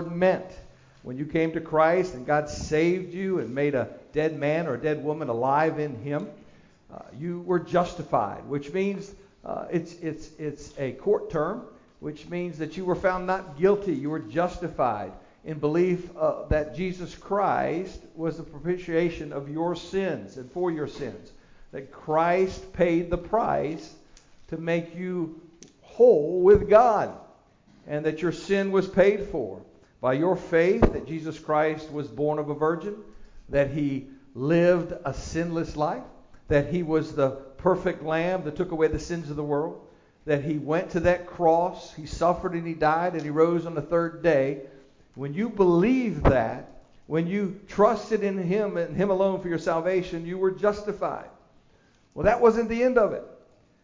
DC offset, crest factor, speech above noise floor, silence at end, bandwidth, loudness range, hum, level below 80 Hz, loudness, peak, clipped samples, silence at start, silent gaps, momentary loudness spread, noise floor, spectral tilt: under 0.1%; 20 dB; 35 dB; 0.5 s; 7.6 kHz; 7 LU; none; -46 dBFS; -26 LUFS; -6 dBFS; under 0.1%; 0 s; none; 14 LU; -60 dBFS; -7 dB/octave